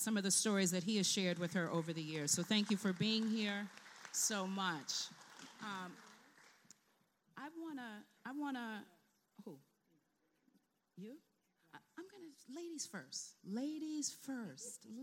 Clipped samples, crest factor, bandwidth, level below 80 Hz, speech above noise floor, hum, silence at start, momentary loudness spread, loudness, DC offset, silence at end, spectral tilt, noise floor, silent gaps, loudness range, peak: under 0.1%; 22 dB; 16.5 kHz; under -90 dBFS; 40 dB; none; 0 s; 21 LU; -40 LUFS; under 0.1%; 0 s; -3 dB/octave; -81 dBFS; none; 19 LU; -20 dBFS